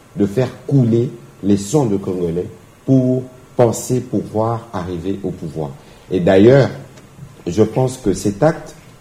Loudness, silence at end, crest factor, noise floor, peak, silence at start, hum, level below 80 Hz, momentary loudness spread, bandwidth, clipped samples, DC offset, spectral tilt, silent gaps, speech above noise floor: -17 LUFS; 0.3 s; 16 dB; -38 dBFS; 0 dBFS; 0.15 s; none; -46 dBFS; 13 LU; 15.5 kHz; under 0.1%; under 0.1%; -7 dB/octave; none; 23 dB